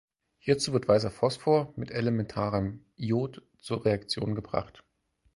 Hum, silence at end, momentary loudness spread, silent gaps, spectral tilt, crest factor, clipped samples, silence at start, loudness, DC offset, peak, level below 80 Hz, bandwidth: none; 0.65 s; 12 LU; none; -6 dB/octave; 20 dB; under 0.1%; 0.45 s; -29 LUFS; under 0.1%; -8 dBFS; -56 dBFS; 11.5 kHz